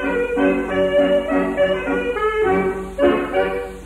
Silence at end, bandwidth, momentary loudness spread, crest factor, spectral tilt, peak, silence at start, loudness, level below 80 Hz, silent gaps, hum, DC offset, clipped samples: 0 s; 12.5 kHz; 4 LU; 14 dB; -6.5 dB/octave; -4 dBFS; 0 s; -19 LUFS; -40 dBFS; none; none; under 0.1%; under 0.1%